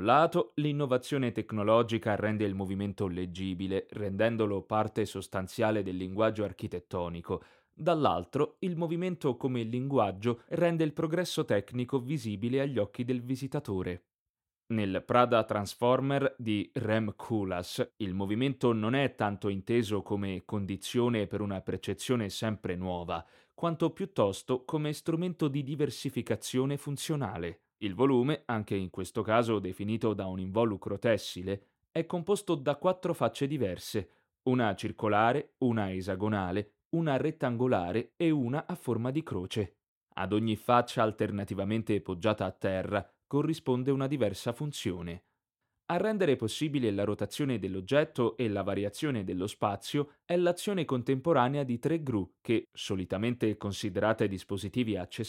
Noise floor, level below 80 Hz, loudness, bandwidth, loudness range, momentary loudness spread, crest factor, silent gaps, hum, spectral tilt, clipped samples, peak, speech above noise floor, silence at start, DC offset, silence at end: under -90 dBFS; -64 dBFS; -32 LUFS; 16.5 kHz; 2 LU; 8 LU; 24 dB; 14.19-14.34 s, 36.85-36.91 s, 39.88-40.01 s; none; -6.5 dB/octave; under 0.1%; -8 dBFS; over 59 dB; 0 s; under 0.1%; 0 s